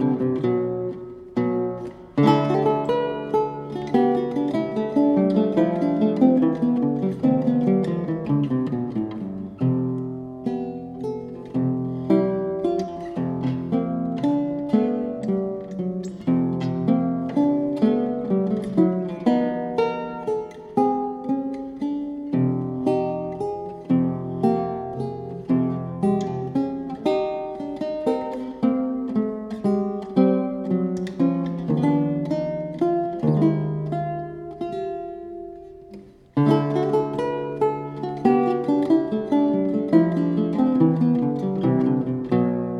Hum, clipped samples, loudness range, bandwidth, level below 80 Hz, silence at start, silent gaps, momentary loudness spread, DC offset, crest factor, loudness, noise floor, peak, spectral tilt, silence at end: none; under 0.1%; 5 LU; 9.2 kHz; -56 dBFS; 0 s; none; 10 LU; under 0.1%; 18 dB; -23 LUFS; -44 dBFS; -4 dBFS; -9.5 dB/octave; 0 s